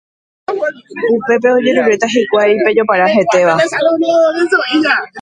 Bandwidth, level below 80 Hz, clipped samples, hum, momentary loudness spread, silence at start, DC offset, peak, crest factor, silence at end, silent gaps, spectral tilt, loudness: 10.5 kHz; -60 dBFS; under 0.1%; none; 8 LU; 0.5 s; under 0.1%; 0 dBFS; 12 dB; 0 s; none; -4.5 dB/octave; -12 LUFS